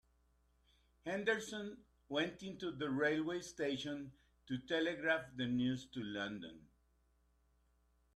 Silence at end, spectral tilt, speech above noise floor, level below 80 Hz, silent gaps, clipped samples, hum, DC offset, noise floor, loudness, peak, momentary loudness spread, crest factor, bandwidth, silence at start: 1.55 s; -5 dB/octave; 35 dB; -72 dBFS; none; under 0.1%; none; under 0.1%; -76 dBFS; -40 LUFS; -22 dBFS; 13 LU; 22 dB; 12.5 kHz; 1.05 s